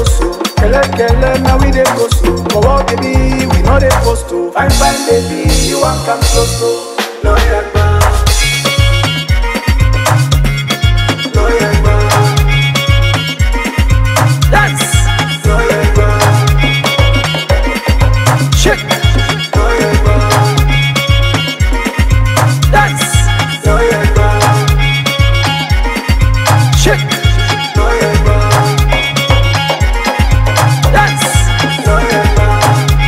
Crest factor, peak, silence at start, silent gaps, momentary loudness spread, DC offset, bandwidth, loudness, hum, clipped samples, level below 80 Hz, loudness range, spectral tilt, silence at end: 10 dB; 0 dBFS; 0 s; none; 3 LU; under 0.1%; 16.5 kHz; -10 LUFS; none; under 0.1%; -14 dBFS; 1 LU; -4.5 dB/octave; 0 s